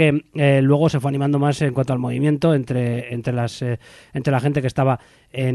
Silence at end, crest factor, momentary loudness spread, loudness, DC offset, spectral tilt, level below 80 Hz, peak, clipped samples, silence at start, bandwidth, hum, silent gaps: 0 s; 16 dB; 10 LU; -20 LUFS; under 0.1%; -7.5 dB/octave; -52 dBFS; -4 dBFS; under 0.1%; 0 s; 12 kHz; none; none